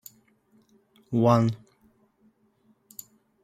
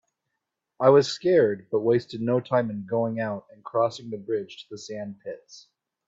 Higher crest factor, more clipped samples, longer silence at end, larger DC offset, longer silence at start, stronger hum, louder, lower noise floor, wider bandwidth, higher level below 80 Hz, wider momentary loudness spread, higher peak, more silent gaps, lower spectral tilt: about the same, 24 dB vs 22 dB; neither; first, 1.85 s vs 0.45 s; neither; first, 1.1 s vs 0.8 s; neither; about the same, -24 LUFS vs -24 LUFS; second, -65 dBFS vs -82 dBFS; first, 15.5 kHz vs 7.8 kHz; about the same, -64 dBFS vs -68 dBFS; first, 24 LU vs 18 LU; about the same, -6 dBFS vs -4 dBFS; neither; first, -8 dB/octave vs -6 dB/octave